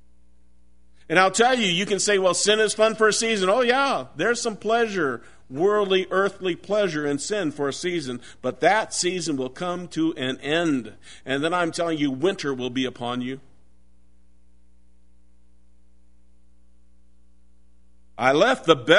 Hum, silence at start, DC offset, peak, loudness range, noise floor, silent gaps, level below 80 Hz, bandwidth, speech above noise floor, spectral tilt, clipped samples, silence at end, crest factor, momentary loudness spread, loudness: none; 1.1 s; 0.5%; -2 dBFS; 9 LU; -60 dBFS; none; -60 dBFS; 11 kHz; 37 dB; -3.5 dB/octave; under 0.1%; 0 s; 22 dB; 10 LU; -22 LUFS